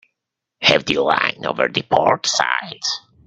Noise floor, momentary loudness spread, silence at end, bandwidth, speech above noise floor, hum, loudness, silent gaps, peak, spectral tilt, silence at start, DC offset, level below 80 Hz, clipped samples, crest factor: -81 dBFS; 7 LU; 0.3 s; 9 kHz; 62 dB; none; -18 LUFS; none; 0 dBFS; -2.5 dB/octave; 0.6 s; under 0.1%; -58 dBFS; under 0.1%; 20 dB